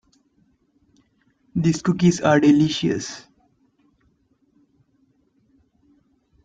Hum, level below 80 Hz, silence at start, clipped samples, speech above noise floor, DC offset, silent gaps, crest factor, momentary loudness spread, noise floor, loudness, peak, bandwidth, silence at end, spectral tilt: none; -58 dBFS; 1.55 s; under 0.1%; 46 dB; under 0.1%; none; 20 dB; 15 LU; -64 dBFS; -19 LUFS; -4 dBFS; 9.2 kHz; 3.25 s; -6 dB/octave